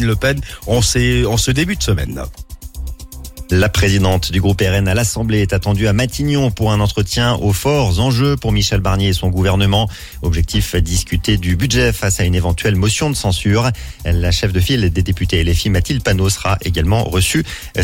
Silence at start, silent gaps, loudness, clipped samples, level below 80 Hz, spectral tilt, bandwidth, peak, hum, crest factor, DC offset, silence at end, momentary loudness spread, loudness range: 0 s; none; -15 LUFS; under 0.1%; -24 dBFS; -5 dB/octave; 17 kHz; -2 dBFS; none; 12 dB; under 0.1%; 0 s; 6 LU; 2 LU